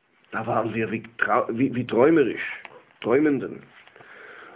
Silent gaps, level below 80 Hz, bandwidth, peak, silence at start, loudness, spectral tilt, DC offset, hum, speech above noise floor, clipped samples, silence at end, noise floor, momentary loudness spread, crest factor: none; -62 dBFS; 4 kHz; -4 dBFS; 0.3 s; -23 LUFS; -10.5 dB/octave; under 0.1%; none; 24 dB; under 0.1%; 0 s; -47 dBFS; 18 LU; 20 dB